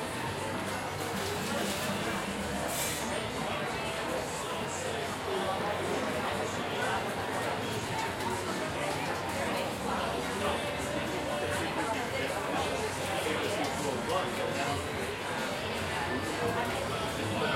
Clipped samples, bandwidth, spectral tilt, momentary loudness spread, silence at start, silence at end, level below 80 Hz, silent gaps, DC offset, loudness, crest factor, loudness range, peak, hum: under 0.1%; 16.5 kHz; -3.5 dB/octave; 3 LU; 0 s; 0 s; -56 dBFS; none; under 0.1%; -33 LUFS; 16 dB; 1 LU; -18 dBFS; none